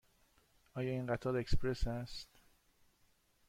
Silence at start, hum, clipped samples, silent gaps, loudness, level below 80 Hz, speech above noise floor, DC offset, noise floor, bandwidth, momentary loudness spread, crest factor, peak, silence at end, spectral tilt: 0.75 s; none; under 0.1%; none; -40 LUFS; -46 dBFS; 38 dB; under 0.1%; -73 dBFS; 12 kHz; 13 LU; 20 dB; -20 dBFS; 1.25 s; -6.5 dB/octave